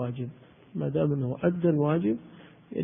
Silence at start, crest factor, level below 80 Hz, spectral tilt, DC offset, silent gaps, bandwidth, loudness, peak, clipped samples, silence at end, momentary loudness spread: 0 s; 18 dB; -60 dBFS; -12.5 dB/octave; under 0.1%; none; 3.7 kHz; -28 LUFS; -12 dBFS; under 0.1%; 0 s; 13 LU